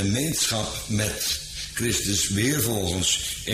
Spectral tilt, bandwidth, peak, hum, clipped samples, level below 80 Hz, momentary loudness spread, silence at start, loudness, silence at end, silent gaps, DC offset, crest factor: -3 dB/octave; 15.5 kHz; -10 dBFS; none; under 0.1%; -44 dBFS; 5 LU; 0 s; -24 LUFS; 0 s; none; under 0.1%; 16 dB